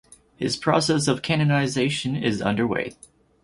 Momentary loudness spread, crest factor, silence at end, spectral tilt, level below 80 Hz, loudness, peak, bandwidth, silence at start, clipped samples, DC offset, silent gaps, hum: 8 LU; 20 dB; 0.5 s; -5 dB/octave; -54 dBFS; -23 LUFS; -4 dBFS; 11.5 kHz; 0.4 s; under 0.1%; under 0.1%; none; none